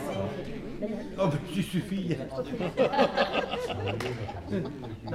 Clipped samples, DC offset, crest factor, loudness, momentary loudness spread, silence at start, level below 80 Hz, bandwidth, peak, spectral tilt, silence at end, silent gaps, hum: under 0.1%; under 0.1%; 20 dB; -31 LUFS; 11 LU; 0 s; -50 dBFS; 15.5 kHz; -10 dBFS; -6.5 dB/octave; 0 s; none; none